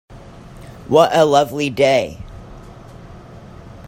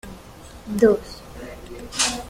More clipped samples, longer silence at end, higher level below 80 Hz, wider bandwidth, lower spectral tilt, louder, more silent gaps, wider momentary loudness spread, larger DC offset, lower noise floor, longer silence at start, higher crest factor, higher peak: neither; about the same, 0 s vs 0 s; about the same, -44 dBFS vs -44 dBFS; about the same, 16 kHz vs 16 kHz; first, -5 dB/octave vs -3 dB/octave; first, -15 LUFS vs -21 LUFS; neither; about the same, 25 LU vs 23 LU; neither; second, -38 dBFS vs -42 dBFS; about the same, 0.1 s vs 0.05 s; about the same, 18 dB vs 22 dB; first, 0 dBFS vs -4 dBFS